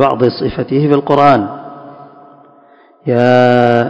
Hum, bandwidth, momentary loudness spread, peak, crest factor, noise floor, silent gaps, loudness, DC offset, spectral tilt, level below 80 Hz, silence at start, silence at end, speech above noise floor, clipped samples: none; 8 kHz; 18 LU; 0 dBFS; 12 dB; -45 dBFS; none; -11 LUFS; under 0.1%; -8 dB/octave; -46 dBFS; 0 s; 0 s; 35 dB; 1%